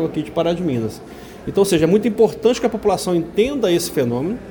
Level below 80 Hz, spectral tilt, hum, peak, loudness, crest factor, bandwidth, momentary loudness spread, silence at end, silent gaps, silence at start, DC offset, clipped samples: -46 dBFS; -5.5 dB/octave; none; -2 dBFS; -18 LUFS; 16 dB; over 20 kHz; 9 LU; 0 s; none; 0 s; under 0.1%; under 0.1%